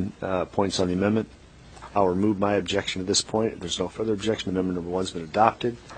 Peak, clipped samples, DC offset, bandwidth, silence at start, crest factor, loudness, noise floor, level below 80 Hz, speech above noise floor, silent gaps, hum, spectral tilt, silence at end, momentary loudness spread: -2 dBFS; under 0.1%; under 0.1%; 9.4 kHz; 0 s; 24 dB; -25 LUFS; -45 dBFS; -52 dBFS; 20 dB; none; none; -4.5 dB/octave; 0 s; 7 LU